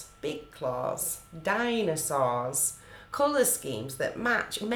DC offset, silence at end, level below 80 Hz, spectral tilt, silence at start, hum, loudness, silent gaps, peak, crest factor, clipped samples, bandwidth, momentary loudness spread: under 0.1%; 0 s; -60 dBFS; -3 dB/octave; 0 s; none; -29 LUFS; none; -12 dBFS; 18 dB; under 0.1%; over 20 kHz; 11 LU